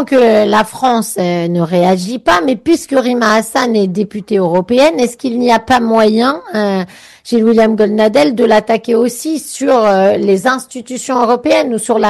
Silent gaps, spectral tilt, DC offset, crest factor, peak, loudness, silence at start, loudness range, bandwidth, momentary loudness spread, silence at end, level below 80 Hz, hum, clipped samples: none; -5 dB/octave; under 0.1%; 10 dB; -2 dBFS; -12 LUFS; 0 s; 1 LU; 13 kHz; 7 LU; 0 s; -48 dBFS; none; under 0.1%